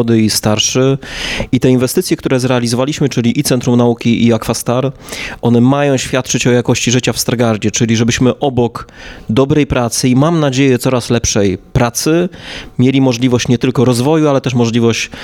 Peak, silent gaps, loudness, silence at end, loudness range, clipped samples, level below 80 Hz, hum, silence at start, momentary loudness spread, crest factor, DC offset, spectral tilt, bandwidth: -2 dBFS; none; -12 LUFS; 0 s; 1 LU; under 0.1%; -36 dBFS; none; 0 s; 6 LU; 12 dB; under 0.1%; -5 dB/octave; 17 kHz